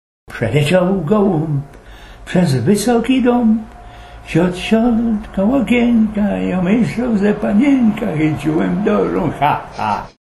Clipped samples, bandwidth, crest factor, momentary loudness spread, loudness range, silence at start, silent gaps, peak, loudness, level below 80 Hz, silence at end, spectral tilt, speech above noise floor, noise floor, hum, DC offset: under 0.1%; 12.5 kHz; 14 dB; 7 LU; 1 LU; 0.3 s; none; 0 dBFS; -15 LUFS; -38 dBFS; 0.2 s; -7 dB/octave; 22 dB; -37 dBFS; none; under 0.1%